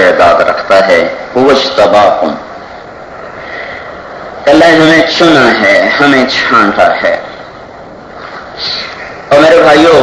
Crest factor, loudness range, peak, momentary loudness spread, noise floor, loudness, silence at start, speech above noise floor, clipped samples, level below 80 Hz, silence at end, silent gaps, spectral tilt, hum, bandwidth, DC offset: 8 dB; 5 LU; 0 dBFS; 22 LU; -28 dBFS; -6 LUFS; 0 s; 22 dB; 6%; -42 dBFS; 0 s; none; -4.5 dB/octave; none; 11 kHz; under 0.1%